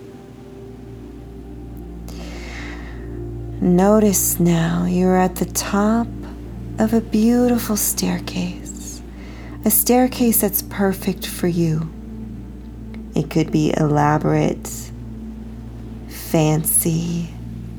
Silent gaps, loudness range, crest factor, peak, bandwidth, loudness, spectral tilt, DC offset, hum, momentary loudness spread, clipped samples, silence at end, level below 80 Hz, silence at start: none; 5 LU; 18 dB; -2 dBFS; over 20 kHz; -18 LUFS; -5.5 dB/octave; under 0.1%; none; 20 LU; under 0.1%; 0 s; -36 dBFS; 0 s